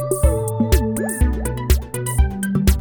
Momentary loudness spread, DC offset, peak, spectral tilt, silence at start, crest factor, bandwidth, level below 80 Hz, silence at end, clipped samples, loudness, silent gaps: 3 LU; under 0.1%; -2 dBFS; -6 dB/octave; 0 s; 16 dB; over 20 kHz; -20 dBFS; 0 s; under 0.1%; -20 LUFS; none